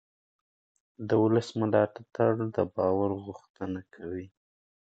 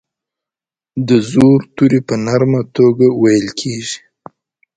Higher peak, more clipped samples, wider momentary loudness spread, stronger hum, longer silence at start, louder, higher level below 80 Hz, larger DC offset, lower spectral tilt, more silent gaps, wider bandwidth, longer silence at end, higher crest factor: second, -10 dBFS vs 0 dBFS; neither; about the same, 14 LU vs 12 LU; neither; about the same, 1 s vs 0.95 s; second, -29 LUFS vs -13 LUFS; second, -58 dBFS vs -50 dBFS; neither; first, -8 dB/octave vs -6.5 dB/octave; first, 3.50-3.54 s vs none; second, 8.2 kHz vs 9.6 kHz; second, 0.6 s vs 0.8 s; first, 20 dB vs 14 dB